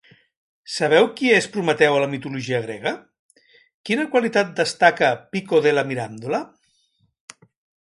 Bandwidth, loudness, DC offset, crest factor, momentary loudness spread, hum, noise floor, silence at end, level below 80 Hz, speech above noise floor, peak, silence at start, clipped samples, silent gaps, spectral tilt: 11.5 kHz; -20 LUFS; under 0.1%; 20 dB; 11 LU; none; -66 dBFS; 1.35 s; -68 dBFS; 46 dB; 0 dBFS; 0.7 s; under 0.1%; 3.19-3.29 s, 3.74-3.84 s; -4.5 dB/octave